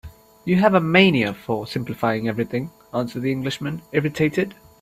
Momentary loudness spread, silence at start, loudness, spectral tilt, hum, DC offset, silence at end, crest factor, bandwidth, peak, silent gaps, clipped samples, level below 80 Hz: 13 LU; 0.05 s; -21 LUFS; -6.5 dB/octave; none; under 0.1%; 0.3 s; 20 dB; 14.5 kHz; 0 dBFS; none; under 0.1%; -54 dBFS